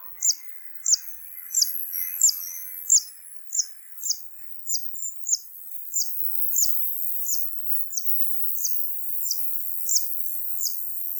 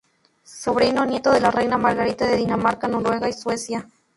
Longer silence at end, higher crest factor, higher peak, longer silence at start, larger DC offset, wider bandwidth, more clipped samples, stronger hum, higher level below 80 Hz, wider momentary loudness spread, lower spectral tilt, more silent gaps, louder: second, 0 s vs 0.35 s; about the same, 20 dB vs 18 dB; second, -8 dBFS vs -4 dBFS; second, 0 s vs 0.5 s; neither; first, 19.5 kHz vs 11.5 kHz; neither; neither; second, -88 dBFS vs -52 dBFS; first, 12 LU vs 9 LU; second, 7.5 dB/octave vs -5 dB/octave; neither; about the same, -22 LUFS vs -21 LUFS